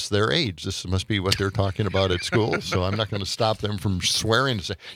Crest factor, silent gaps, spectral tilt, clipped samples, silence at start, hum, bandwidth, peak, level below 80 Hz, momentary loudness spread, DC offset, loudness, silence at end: 22 dB; none; -4.5 dB/octave; under 0.1%; 0 s; none; 16 kHz; -2 dBFS; -50 dBFS; 6 LU; under 0.1%; -24 LUFS; 0 s